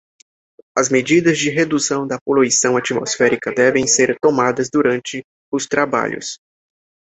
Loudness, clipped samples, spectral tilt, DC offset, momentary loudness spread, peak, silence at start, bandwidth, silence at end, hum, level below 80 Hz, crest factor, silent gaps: -16 LUFS; under 0.1%; -3.5 dB/octave; under 0.1%; 10 LU; 0 dBFS; 0.75 s; 8.4 kHz; 0.7 s; none; -58 dBFS; 16 dB; 2.21-2.26 s, 5.24-5.52 s